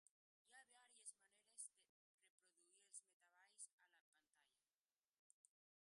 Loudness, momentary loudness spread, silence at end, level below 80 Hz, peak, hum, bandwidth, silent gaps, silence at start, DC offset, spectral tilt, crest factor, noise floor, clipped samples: -62 LUFS; 9 LU; 0.45 s; under -90 dBFS; -42 dBFS; none; 11 kHz; 0.11-0.45 s, 1.89-2.18 s, 2.30-2.38 s, 3.13-3.20 s, 3.73-3.78 s, 4.01-4.12 s, 4.81-4.85 s, 4.99-5.44 s; 0.05 s; under 0.1%; 3 dB/octave; 28 dB; under -90 dBFS; under 0.1%